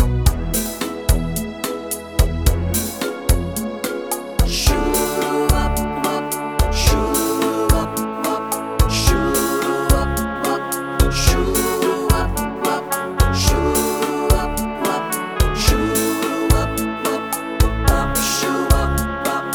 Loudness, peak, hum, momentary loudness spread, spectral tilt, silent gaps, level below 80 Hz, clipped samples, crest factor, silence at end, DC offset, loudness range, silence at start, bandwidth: -19 LUFS; 0 dBFS; none; 6 LU; -4.5 dB/octave; none; -22 dBFS; under 0.1%; 18 dB; 0 s; under 0.1%; 2 LU; 0 s; 19.5 kHz